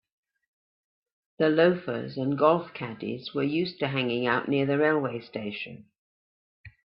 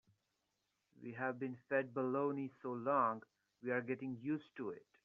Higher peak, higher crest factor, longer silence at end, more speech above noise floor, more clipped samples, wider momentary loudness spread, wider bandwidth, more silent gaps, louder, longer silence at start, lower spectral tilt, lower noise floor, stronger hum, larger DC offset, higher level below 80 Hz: first, -6 dBFS vs -22 dBFS; about the same, 22 dB vs 20 dB; about the same, 0.15 s vs 0.25 s; first, over 64 dB vs 45 dB; neither; about the same, 12 LU vs 12 LU; about the same, 5.6 kHz vs 5.8 kHz; first, 5.98-6.64 s vs none; first, -27 LUFS vs -41 LUFS; first, 1.4 s vs 1 s; first, -10 dB/octave vs -6.5 dB/octave; first, under -90 dBFS vs -86 dBFS; neither; neither; first, -70 dBFS vs -88 dBFS